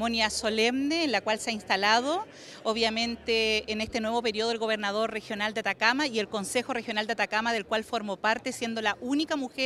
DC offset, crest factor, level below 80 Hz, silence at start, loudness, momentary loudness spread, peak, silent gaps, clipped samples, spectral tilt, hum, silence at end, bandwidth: under 0.1%; 20 dB; -60 dBFS; 0 s; -28 LUFS; 6 LU; -8 dBFS; none; under 0.1%; -2.5 dB/octave; none; 0 s; 14.5 kHz